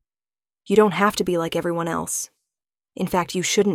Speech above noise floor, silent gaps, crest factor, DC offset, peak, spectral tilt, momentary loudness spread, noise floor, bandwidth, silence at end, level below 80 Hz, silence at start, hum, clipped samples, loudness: over 69 dB; none; 20 dB; under 0.1%; -4 dBFS; -4 dB/octave; 9 LU; under -90 dBFS; 16.5 kHz; 0 s; -56 dBFS; 0.7 s; none; under 0.1%; -22 LUFS